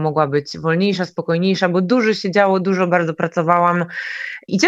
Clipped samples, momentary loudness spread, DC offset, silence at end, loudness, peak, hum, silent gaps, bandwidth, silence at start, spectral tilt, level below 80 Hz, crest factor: under 0.1%; 8 LU; under 0.1%; 0 s; -18 LUFS; 0 dBFS; none; none; 7.8 kHz; 0 s; -6 dB/octave; -64 dBFS; 18 dB